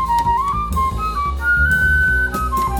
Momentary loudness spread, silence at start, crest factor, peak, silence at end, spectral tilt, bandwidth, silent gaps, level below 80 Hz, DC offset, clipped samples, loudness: 6 LU; 0 s; 12 dB; -6 dBFS; 0 s; -5 dB/octave; 18.5 kHz; none; -24 dBFS; under 0.1%; under 0.1%; -17 LUFS